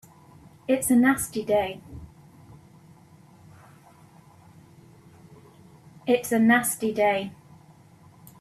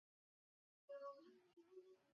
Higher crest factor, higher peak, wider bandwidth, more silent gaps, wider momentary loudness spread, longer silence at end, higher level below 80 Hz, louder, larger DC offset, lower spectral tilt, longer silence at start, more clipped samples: about the same, 20 dB vs 18 dB; first, -8 dBFS vs -44 dBFS; first, 15 kHz vs 6.6 kHz; neither; first, 20 LU vs 10 LU; first, 1.1 s vs 0 s; first, -60 dBFS vs under -90 dBFS; first, -23 LUFS vs -60 LUFS; neither; first, -4 dB/octave vs -2.5 dB/octave; second, 0.7 s vs 0.9 s; neither